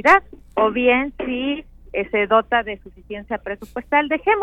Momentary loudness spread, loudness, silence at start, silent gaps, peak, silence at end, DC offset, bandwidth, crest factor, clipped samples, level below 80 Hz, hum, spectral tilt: 14 LU; -20 LUFS; 0.05 s; none; -2 dBFS; 0 s; under 0.1%; 14 kHz; 18 dB; under 0.1%; -46 dBFS; none; -5 dB/octave